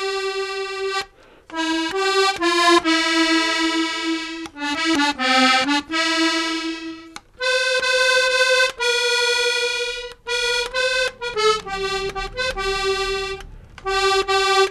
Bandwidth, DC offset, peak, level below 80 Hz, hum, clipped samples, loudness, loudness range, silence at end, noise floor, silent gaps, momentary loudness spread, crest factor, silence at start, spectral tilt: 14 kHz; under 0.1%; -4 dBFS; -46 dBFS; none; under 0.1%; -19 LUFS; 4 LU; 0 s; -45 dBFS; none; 11 LU; 18 dB; 0 s; -1.5 dB/octave